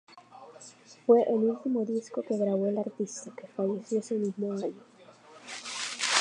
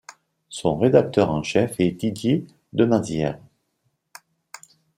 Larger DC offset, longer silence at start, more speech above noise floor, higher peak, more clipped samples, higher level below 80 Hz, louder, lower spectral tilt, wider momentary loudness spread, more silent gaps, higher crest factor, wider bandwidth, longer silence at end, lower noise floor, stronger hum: neither; about the same, 0.15 s vs 0.1 s; second, 25 dB vs 52 dB; second, -6 dBFS vs -2 dBFS; neither; second, -86 dBFS vs -54 dBFS; second, -30 LUFS vs -22 LUFS; second, -4 dB/octave vs -6.5 dB/octave; first, 24 LU vs 21 LU; neither; about the same, 24 dB vs 20 dB; second, 11 kHz vs 16 kHz; second, 0 s vs 1.6 s; second, -54 dBFS vs -72 dBFS; neither